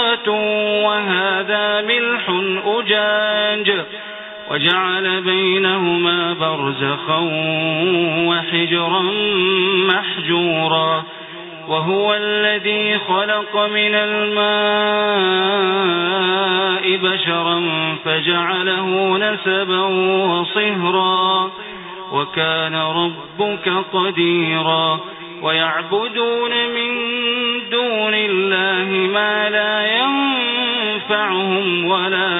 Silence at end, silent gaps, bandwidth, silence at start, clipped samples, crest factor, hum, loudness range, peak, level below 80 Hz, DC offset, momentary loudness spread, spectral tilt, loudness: 0 s; none; 4.1 kHz; 0 s; under 0.1%; 18 dB; none; 2 LU; 0 dBFS; -64 dBFS; under 0.1%; 4 LU; -1.5 dB/octave; -16 LUFS